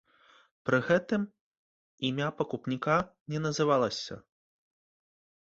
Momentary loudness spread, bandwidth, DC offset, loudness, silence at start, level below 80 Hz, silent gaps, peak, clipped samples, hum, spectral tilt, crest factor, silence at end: 12 LU; 8 kHz; under 0.1%; -30 LUFS; 0.65 s; -66 dBFS; 1.41-1.98 s, 3.21-3.26 s; -12 dBFS; under 0.1%; none; -5.5 dB/octave; 20 dB; 1.2 s